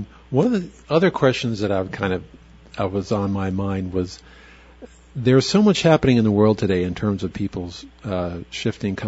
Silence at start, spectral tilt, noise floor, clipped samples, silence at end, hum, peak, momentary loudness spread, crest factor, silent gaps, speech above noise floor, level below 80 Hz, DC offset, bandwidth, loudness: 0 s; -6.5 dB/octave; -44 dBFS; under 0.1%; 0 s; none; 0 dBFS; 13 LU; 20 dB; none; 24 dB; -46 dBFS; under 0.1%; 8 kHz; -21 LUFS